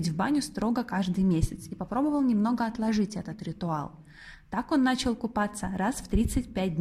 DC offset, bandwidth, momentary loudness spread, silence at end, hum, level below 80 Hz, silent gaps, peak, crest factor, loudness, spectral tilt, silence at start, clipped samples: under 0.1%; 15 kHz; 11 LU; 0 s; none; -42 dBFS; none; -12 dBFS; 16 dB; -29 LUFS; -6 dB/octave; 0 s; under 0.1%